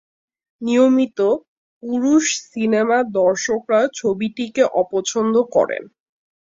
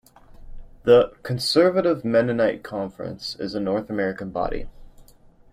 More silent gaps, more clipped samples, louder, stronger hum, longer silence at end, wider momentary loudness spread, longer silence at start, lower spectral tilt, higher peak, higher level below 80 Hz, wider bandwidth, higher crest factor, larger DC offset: first, 1.48-1.81 s vs none; neither; first, -18 LUFS vs -22 LUFS; neither; first, 0.65 s vs 0.5 s; second, 7 LU vs 14 LU; first, 0.6 s vs 0.4 s; second, -4 dB/octave vs -5.5 dB/octave; about the same, -4 dBFS vs -4 dBFS; second, -64 dBFS vs -44 dBFS; second, 7.8 kHz vs 15 kHz; about the same, 16 dB vs 20 dB; neither